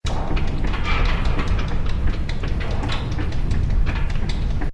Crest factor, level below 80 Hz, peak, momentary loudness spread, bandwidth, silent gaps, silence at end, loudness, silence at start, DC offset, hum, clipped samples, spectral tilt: 12 dB; -20 dBFS; -6 dBFS; 3 LU; 8.2 kHz; none; 0 s; -25 LUFS; 0.05 s; under 0.1%; none; under 0.1%; -6.5 dB/octave